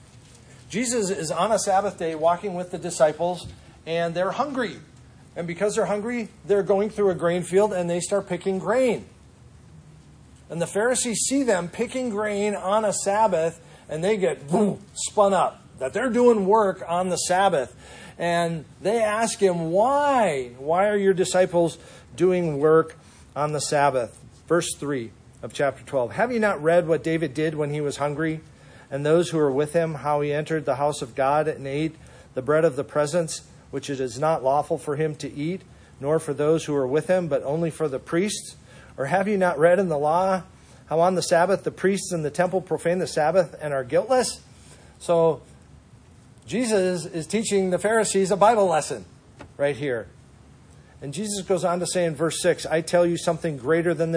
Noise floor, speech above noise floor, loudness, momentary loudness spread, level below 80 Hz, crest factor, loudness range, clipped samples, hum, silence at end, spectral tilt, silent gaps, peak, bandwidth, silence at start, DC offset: -50 dBFS; 28 dB; -23 LUFS; 11 LU; -56 dBFS; 20 dB; 4 LU; under 0.1%; none; 0 s; -5 dB/octave; none; -4 dBFS; 10.5 kHz; 0.5 s; under 0.1%